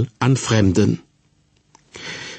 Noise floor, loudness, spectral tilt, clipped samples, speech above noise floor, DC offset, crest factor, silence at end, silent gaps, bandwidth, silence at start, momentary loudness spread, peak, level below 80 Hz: -60 dBFS; -18 LUFS; -6 dB/octave; under 0.1%; 42 dB; under 0.1%; 16 dB; 0 s; none; 8.8 kHz; 0 s; 16 LU; -4 dBFS; -48 dBFS